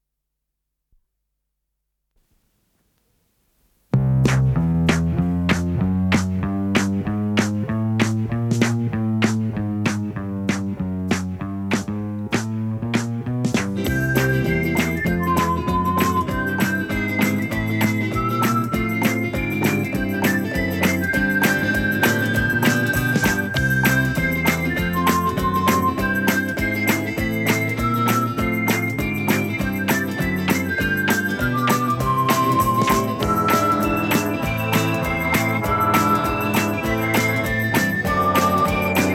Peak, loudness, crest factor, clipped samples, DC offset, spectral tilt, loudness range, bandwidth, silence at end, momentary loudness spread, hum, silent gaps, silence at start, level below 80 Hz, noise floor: -4 dBFS; -20 LUFS; 18 dB; under 0.1%; under 0.1%; -5.5 dB/octave; 4 LU; 17.5 kHz; 0 s; 5 LU; none; none; 3.95 s; -40 dBFS; -79 dBFS